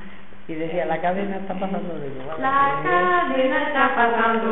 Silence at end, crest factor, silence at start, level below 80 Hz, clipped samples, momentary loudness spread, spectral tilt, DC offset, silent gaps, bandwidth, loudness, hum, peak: 0 s; 18 dB; 0 s; -52 dBFS; under 0.1%; 12 LU; -10 dB/octave; 3%; none; 4.1 kHz; -21 LUFS; none; -4 dBFS